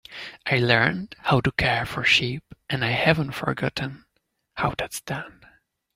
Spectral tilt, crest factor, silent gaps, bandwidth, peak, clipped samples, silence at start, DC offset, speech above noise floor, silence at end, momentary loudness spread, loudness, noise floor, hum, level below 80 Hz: -5 dB/octave; 22 dB; none; 16 kHz; -2 dBFS; under 0.1%; 0.1 s; under 0.1%; 50 dB; 0.65 s; 14 LU; -23 LUFS; -74 dBFS; none; -48 dBFS